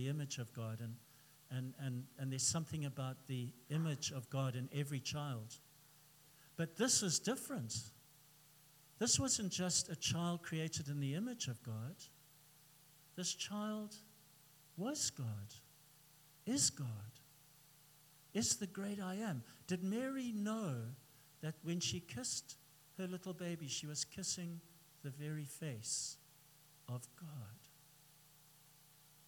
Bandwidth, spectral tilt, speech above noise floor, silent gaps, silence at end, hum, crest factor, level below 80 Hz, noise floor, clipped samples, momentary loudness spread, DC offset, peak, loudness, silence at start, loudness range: 18 kHz; -3.5 dB/octave; 24 dB; none; 0.05 s; 60 Hz at -70 dBFS; 24 dB; -78 dBFS; -66 dBFS; under 0.1%; 17 LU; under 0.1%; -20 dBFS; -41 LUFS; 0 s; 8 LU